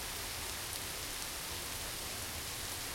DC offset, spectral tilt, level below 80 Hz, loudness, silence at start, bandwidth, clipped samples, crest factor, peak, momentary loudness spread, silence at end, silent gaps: under 0.1%; -1.5 dB/octave; -54 dBFS; -39 LUFS; 0 s; 16.5 kHz; under 0.1%; 22 dB; -20 dBFS; 0 LU; 0 s; none